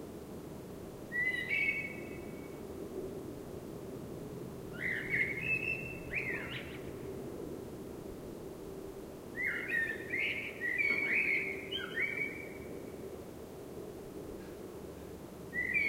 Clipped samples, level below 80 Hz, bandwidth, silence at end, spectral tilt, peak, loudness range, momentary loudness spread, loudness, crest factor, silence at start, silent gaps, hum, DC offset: under 0.1%; -60 dBFS; 16 kHz; 0 s; -4.5 dB/octave; -20 dBFS; 9 LU; 16 LU; -37 LUFS; 18 dB; 0 s; none; none; under 0.1%